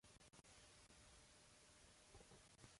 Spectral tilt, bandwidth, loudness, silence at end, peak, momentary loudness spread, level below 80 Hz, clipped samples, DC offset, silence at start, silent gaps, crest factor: -2.5 dB/octave; 11.5 kHz; -67 LUFS; 0 s; -48 dBFS; 2 LU; -78 dBFS; under 0.1%; under 0.1%; 0.05 s; none; 20 dB